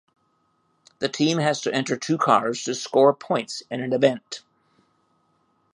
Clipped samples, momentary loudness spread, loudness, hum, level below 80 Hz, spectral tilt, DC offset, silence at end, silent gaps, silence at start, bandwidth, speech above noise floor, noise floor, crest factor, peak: under 0.1%; 11 LU; -23 LUFS; none; -72 dBFS; -4.5 dB/octave; under 0.1%; 1.35 s; none; 1 s; 11.5 kHz; 46 dB; -68 dBFS; 22 dB; -2 dBFS